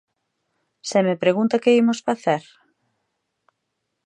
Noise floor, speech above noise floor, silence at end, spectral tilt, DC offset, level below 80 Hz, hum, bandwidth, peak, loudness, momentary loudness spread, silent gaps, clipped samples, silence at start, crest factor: -77 dBFS; 58 dB; 1.65 s; -5.5 dB/octave; under 0.1%; -76 dBFS; none; 10 kHz; -4 dBFS; -20 LUFS; 7 LU; none; under 0.1%; 0.85 s; 18 dB